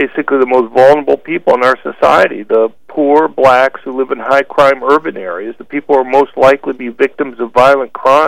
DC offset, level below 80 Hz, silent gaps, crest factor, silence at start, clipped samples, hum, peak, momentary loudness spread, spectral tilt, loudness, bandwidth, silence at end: 1%; -48 dBFS; none; 10 dB; 0 s; 0.6%; none; 0 dBFS; 11 LU; -5.5 dB/octave; -11 LUFS; 12.5 kHz; 0 s